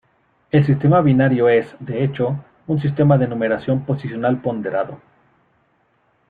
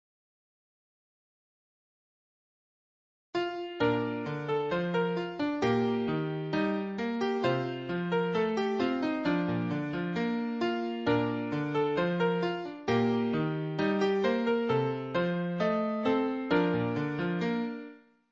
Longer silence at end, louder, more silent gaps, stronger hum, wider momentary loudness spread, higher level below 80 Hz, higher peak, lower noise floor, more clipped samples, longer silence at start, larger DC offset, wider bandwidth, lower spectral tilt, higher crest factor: first, 1.35 s vs 0.35 s; first, -18 LUFS vs -30 LUFS; neither; neither; first, 10 LU vs 5 LU; first, -54 dBFS vs -66 dBFS; first, -4 dBFS vs -14 dBFS; first, -62 dBFS vs -50 dBFS; neither; second, 0.55 s vs 3.35 s; neither; second, 4.6 kHz vs 7.4 kHz; first, -10.5 dB/octave vs -7.5 dB/octave; about the same, 16 dB vs 16 dB